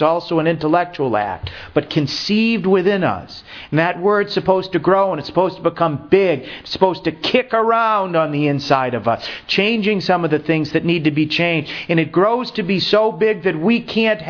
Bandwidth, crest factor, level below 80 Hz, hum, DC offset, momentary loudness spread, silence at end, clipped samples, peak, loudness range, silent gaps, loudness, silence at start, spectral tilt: 5.4 kHz; 18 dB; -50 dBFS; none; under 0.1%; 6 LU; 0 s; under 0.1%; 0 dBFS; 1 LU; none; -17 LUFS; 0 s; -6.5 dB/octave